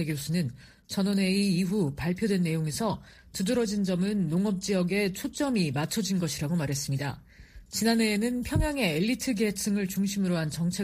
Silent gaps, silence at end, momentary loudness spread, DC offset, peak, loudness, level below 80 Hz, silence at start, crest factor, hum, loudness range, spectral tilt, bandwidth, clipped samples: none; 0 s; 6 LU; under 0.1%; -10 dBFS; -28 LUFS; -48 dBFS; 0 s; 18 dB; none; 1 LU; -5 dB/octave; 15.5 kHz; under 0.1%